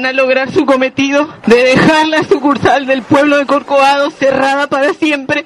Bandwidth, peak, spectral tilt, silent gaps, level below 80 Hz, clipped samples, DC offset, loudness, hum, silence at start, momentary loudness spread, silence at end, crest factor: 12 kHz; 0 dBFS; -5 dB/octave; none; -46 dBFS; 0.2%; under 0.1%; -10 LUFS; none; 0 s; 5 LU; 0 s; 10 dB